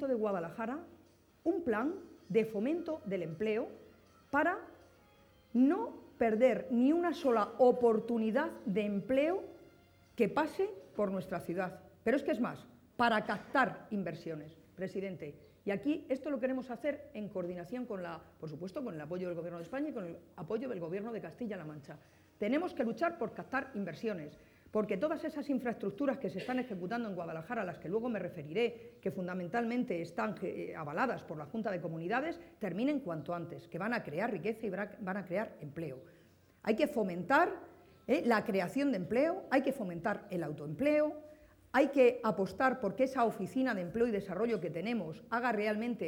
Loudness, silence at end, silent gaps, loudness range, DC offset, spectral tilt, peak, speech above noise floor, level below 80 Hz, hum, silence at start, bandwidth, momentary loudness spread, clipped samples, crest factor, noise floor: -35 LUFS; 0 s; none; 8 LU; under 0.1%; -7 dB/octave; -14 dBFS; 30 dB; -72 dBFS; none; 0 s; 18.5 kHz; 12 LU; under 0.1%; 20 dB; -64 dBFS